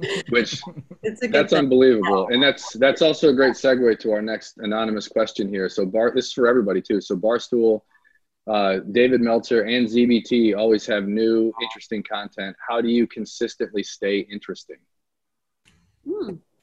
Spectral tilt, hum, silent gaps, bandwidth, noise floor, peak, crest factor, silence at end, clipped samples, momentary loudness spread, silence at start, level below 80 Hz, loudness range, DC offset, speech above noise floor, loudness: -5 dB/octave; none; none; 8.6 kHz; -84 dBFS; -4 dBFS; 16 dB; 0.25 s; under 0.1%; 13 LU; 0 s; -60 dBFS; 8 LU; under 0.1%; 63 dB; -20 LUFS